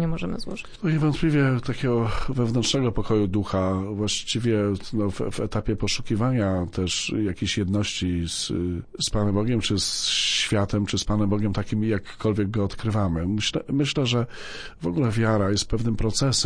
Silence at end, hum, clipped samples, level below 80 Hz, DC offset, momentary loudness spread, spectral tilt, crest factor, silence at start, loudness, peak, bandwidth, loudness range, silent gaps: 0 s; none; under 0.1%; -38 dBFS; under 0.1%; 6 LU; -5 dB/octave; 14 dB; 0 s; -24 LUFS; -10 dBFS; 10.5 kHz; 2 LU; none